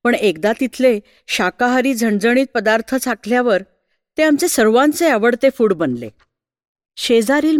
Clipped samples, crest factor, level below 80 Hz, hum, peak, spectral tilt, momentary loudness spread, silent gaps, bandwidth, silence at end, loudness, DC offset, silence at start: under 0.1%; 14 dB; -56 dBFS; none; -2 dBFS; -4 dB/octave; 8 LU; 6.68-6.75 s; 17.5 kHz; 0 s; -16 LUFS; under 0.1%; 0.05 s